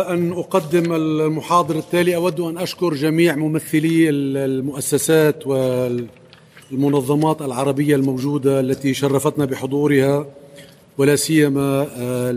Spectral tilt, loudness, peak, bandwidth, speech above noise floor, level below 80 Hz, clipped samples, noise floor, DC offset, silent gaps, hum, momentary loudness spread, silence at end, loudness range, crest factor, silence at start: -6 dB/octave; -18 LUFS; -2 dBFS; 15.5 kHz; 28 dB; -58 dBFS; under 0.1%; -45 dBFS; under 0.1%; none; none; 6 LU; 0 s; 2 LU; 16 dB; 0 s